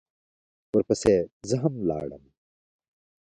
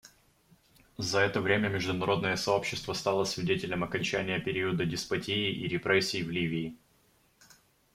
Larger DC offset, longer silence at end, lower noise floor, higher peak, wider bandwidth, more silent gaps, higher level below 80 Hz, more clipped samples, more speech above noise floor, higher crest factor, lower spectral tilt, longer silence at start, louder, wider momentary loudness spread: neither; about the same, 1.15 s vs 1.2 s; first, under -90 dBFS vs -67 dBFS; about the same, -8 dBFS vs -10 dBFS; second, 11 kHz vs 15.5 kHz; first, 1.32-1.40 s vs none; first, -54 dBFS vs -60 dBFS; neither; first, over 65 dB vs 37 dB; about the same, 20 dB vs 20 dB; first, -6.5 dB/octave vs -4.5 dB/octave; first, 0.75 s vs 0.05 s; first, -26 LUFS vs -30 LUFS; first, 9 LU vs 6 LU